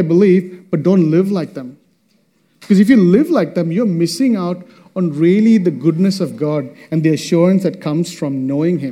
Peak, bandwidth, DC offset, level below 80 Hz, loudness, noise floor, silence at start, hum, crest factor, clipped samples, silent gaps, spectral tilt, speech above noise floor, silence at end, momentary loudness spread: 0 dBFS; 14 kHz; under 0.1%; -62 dBFS; -15 LUFS; -58 dBFS; 0 s; none; 14 dB; under 0.1%; none; -7.5 dB/octave; 45 dB; 0 s; 11 LU